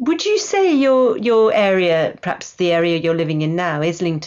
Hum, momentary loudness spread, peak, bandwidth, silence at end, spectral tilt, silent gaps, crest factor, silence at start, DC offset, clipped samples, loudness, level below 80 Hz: none; 6 LU; -6 dBFS; 7.8 kHz; 0 s; -5.5 dB/octave; none; 10 dB; 0 s; under 0.1%; under 0.1%; -17 LUFS; -60 dBFS